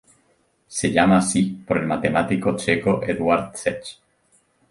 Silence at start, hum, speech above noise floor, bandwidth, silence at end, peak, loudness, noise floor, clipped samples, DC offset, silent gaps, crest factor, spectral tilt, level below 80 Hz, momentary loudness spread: 0.7 s; none; 43 dB; 11.5 kHz; 0.8 s; -2 dBFS; -21 LUFS; -64 dBFS; under 0.1%; under 0.1%; none; 20 dB; -5 dB/octave; -50 dBFS; 10 LU